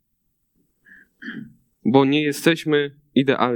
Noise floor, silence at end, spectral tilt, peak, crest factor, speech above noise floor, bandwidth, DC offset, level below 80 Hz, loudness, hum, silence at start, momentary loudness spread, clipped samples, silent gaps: -71 dBFS; 0 s; -5.5 dB/octave; -2 dBFS; 20 dB; 52 dB; 18.5 kHz; under 0.1%; -68 dBFS; -20 LUFS; none; 1.2 s; 19 LU; under 0.1%; none